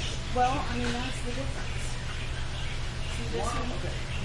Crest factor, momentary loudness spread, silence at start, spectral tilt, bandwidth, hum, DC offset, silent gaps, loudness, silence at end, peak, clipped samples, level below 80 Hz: 16 dB; 8 LU; 0 s; -4.5 dB/octave; 11.5 kHz; none; under 0.1%; none; -32 LUFS; 0 s; -14 dBFS; under 0.1%; -34 dBFS